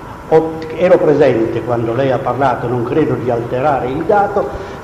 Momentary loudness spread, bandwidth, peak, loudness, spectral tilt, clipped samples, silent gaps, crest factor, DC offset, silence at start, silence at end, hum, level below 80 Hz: 6 LU; 11.5 kHz; 0 dBFS; -14 LUFS; -8 dB/octave; under 0.1%; none; 14 dB; under 0.1%; 0 s; 0 s; none; -40 dBFS